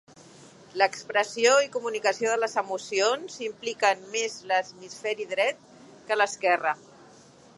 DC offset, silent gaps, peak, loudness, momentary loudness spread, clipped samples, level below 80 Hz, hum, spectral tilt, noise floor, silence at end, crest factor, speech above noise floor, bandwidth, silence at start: under 0.1%; none; -6 dBFS; -26 LUFS; 10 LU; under 0.1%; -78 dBFS; none; -1 dB/octave; -53 dBFS; 0.8 s; 22 dB; 27 dB; 11.5 kHz; 0.75 s